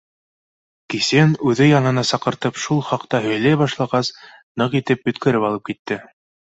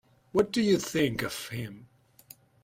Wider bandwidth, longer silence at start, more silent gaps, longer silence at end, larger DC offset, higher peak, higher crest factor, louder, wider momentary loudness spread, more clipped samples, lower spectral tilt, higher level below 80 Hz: second, 8.2 kHz vs 16 kHz; first, 0.9 s vs 0.35 s; first, 4.43-4.55 s, 5.79-5.85 s vs none; second, 0.55 s vs 0.8 s; neither; first, -2 dBFS vs -10 dBFS; about the same, 16 dB vs 20 dB; first, -19 LUFS vs -29 LUFS; about the same, 12 LU vs 12 LU; neither; about the same, -5.5 dB/octave vs -5 dB/octave; about the same, -58 dBFS vs -60 dBFS